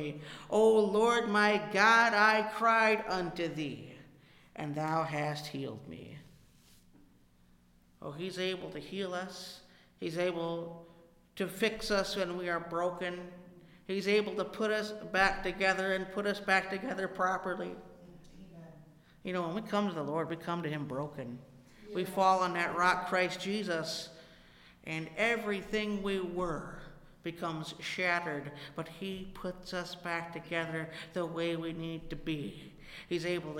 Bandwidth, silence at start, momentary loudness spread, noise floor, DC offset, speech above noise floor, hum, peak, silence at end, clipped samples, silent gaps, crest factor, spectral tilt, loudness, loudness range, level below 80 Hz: 16.5 kHz; 0 s; 19 LU; -64 dBFS; under 0.1%; 31 dB; 60 Hz at -65 dBFS; -12 dBFS; 0 s; under 0.1%; none; 22 dB; -4.5 dB/octave; -33 LUFS; 11 LU; -60 dBFS